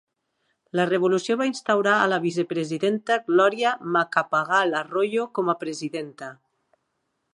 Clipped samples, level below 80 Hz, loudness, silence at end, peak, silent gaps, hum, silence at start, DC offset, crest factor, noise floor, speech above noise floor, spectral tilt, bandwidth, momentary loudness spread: under 0.1%; -76 dBFS; -23 LUFS; 1 s; -6 dBFS; none; none; 0.75 s; under 0.1%; 20 dB; -76 dBFS; 53 dB; -5 dB/octave; 11 kHz; 10 LU